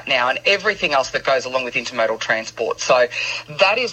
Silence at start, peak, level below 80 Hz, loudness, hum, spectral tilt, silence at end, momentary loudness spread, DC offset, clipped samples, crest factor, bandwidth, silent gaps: 0 s; -2 dBFS; -56 dBFS; -19 LUFS; none; -2 dB/octave; 0 s; 6 LU; under 0.1%; under 0.1%; 18 dB; 8.4 kHz; none